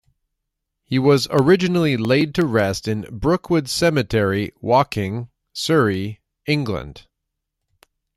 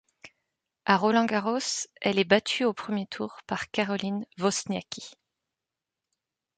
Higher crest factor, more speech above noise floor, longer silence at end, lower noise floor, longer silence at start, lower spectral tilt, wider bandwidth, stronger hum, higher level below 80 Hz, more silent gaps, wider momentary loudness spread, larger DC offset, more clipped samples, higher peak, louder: second, 18 dB vs 24 dB; about the same, 61 dB vs 61 dB; second, 1.15 s vs 1.45 s; second, -79 dBFS vs -89 dBFS; first, 0.9 s vs 0.25 s; first, -6 dB/octave vs -4 dB/octave; first, 14.5 kHz vs 9.4 kHz; neither; first, -46 dBFS vs -70 dBFS; neither; about the same, 11 LU vs 12 LU; neither; neither; first, -2 dBFS vs -6 dBFS; first, -19 LUFS vs -27 LUFS